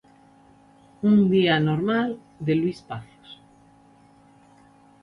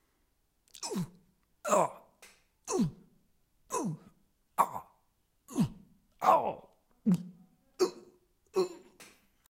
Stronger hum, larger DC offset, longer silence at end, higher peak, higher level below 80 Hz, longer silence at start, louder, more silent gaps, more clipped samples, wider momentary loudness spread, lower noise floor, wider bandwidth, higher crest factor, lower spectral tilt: neither; neither; first, 1.7 s vs 0.5 s; first, -8 dBFS vs -12 dBFS; first, -60 dBFS vs -66 dBFS; first, 1.05 s vs 0.8 s; first, -22 LUFS vs -33 LUFS; neither; neither; about the same, 19 LU vs 18 LU; second, -54 dBFS vs -74 dBFS; second, 6 kHz vs 16 kHz; second, 18 dB vs 24 dB; first, -8 dB/octave vs -5.5 dB/octave